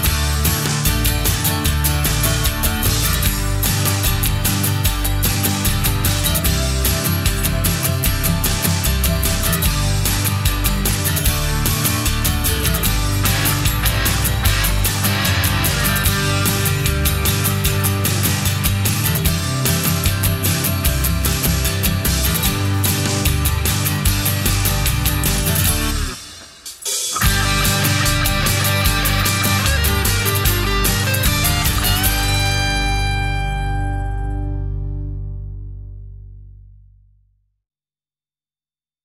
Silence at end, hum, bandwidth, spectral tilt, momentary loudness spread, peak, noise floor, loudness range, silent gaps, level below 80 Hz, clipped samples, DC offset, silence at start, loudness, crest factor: 2.35 s; 50 Hz at -35 dBFS; 16.5 kHz; -3.5 dB/octave; 6 LU; -2 dBFS; under -90 dBFS; 3 LU; none; -24 dBFS; under 0.1%; under 0.1%; 0 s; -17 LUFS; 14 dB